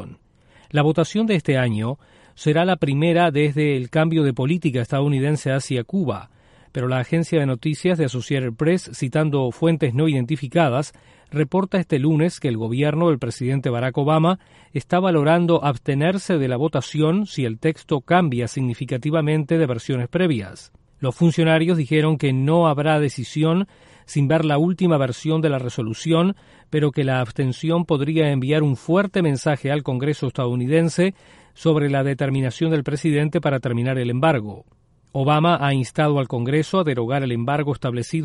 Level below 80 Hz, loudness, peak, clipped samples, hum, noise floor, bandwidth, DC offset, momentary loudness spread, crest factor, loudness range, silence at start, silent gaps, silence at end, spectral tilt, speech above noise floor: -54 dBFS; -20 LUFS; -4 dBFS; under 0.1%; none; -54 dBFS; 11.5 kHz; under 0.1%; 7 LU; 16 dB; 2 LU; 0 s; none; 0 s; -7 dB/octave; 34 dB